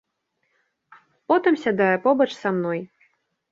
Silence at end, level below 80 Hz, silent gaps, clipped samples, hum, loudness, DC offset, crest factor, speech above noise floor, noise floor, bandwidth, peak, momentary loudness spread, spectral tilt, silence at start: 0.65 s; -70 dBFS; none; under 0.1%; none; -21 LUFS; under 0.1%; 18 dB; 53 dB; -74 dBFS; 7.8 kHz; -6 dBFS; 7 LU; -7 dB/octave; 1.3 s